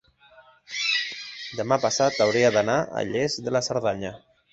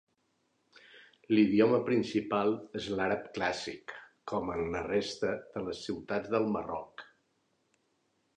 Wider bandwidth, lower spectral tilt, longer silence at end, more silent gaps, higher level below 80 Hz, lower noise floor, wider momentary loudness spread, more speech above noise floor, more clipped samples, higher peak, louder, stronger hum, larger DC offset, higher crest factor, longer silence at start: second, 8.2 kHz vs 9.8 kHz; second, -3.5 dB/octave vs -6 dB/octave; second, 0.35 s vs 1.35 s; neither; about the same, -60 dBFS vs -62 dBFS; second, -54 dBFS vs -76 dBFS; about the same, 13 LU vs 15 LU; second, 31 dB vs 45 dB; neither; first, -6 dBFS vs -12 dBFS; first, -24 LUFS vs -32 LUFS; neither; neither; about the same, 20 dB vs 20 dB; second, 0.7 s vs 0.95 s